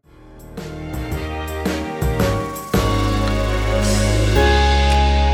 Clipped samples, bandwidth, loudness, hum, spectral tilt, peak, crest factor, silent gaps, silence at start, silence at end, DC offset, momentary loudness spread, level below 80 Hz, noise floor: under 0.1%; 19.5 kHz; -19 LUFS; none; -5.5 dB/octave; -2 dBFS; 16 dB; none; 0.25 s; 0 s; under 0.1%; 13 LU; -22 dBFS; -41 dBFS